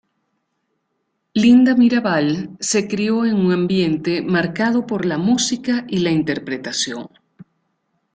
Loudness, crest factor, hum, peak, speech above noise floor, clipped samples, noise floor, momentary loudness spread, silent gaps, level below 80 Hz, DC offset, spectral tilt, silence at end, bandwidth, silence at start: -18 LUFS; 16 dB; none; -2 dBFS; 55 dB; under 0.1%; -72 dBFS; 10 LU; none; -58 dBFS; under 0.1%; -5 dB/octave; 1.1 s; 9.4 kHz; 1.35 s